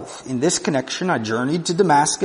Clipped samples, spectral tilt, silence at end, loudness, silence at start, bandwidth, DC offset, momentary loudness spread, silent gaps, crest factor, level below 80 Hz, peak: under 0.1%; -4 dB/octave; 0 s; -20 LUFS; 0 s; 11 kHz; under 0.1%; 6 LU; none; 16 dB; -60 dBFS; -4 dBFS